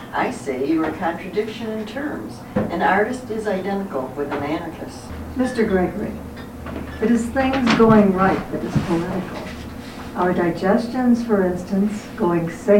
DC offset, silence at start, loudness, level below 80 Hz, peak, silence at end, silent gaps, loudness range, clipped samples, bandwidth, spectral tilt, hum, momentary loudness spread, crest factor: under 0.1%; 0 s; -21 LUFS; -44 dBFS; -4 dBFS; 0 s; none; 5 LU; under 0.1%; 17 kHz; -6.5 dB/octave; none; 14 LU; 18 dB